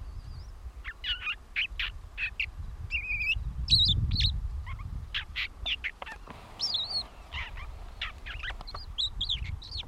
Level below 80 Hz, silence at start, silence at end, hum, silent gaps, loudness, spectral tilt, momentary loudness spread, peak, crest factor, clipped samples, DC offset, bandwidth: -40 dBFS; 0 s; 0 s; none; none; -31 LUFS; -3 dB/octave; 17 LU; -12 dBFS; 22 dB; under 0.1%; under 0.1%; 14 kHz